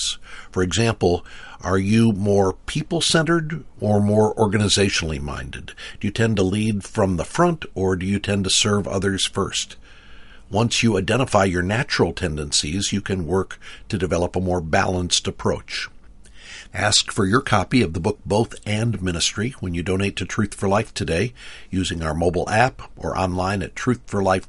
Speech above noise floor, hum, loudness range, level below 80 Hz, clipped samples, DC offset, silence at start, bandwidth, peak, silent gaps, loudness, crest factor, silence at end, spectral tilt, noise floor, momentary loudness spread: 21 dB; none; 3 LU; -40 dBFS; under 0.1%; under 0.1%; 0 s; 11.5 kHz; -2 dBFS; none; -21 LUFS; 20 dB; 0.05 s; -4.5 dB/octave; -42 dBFS; 11 LU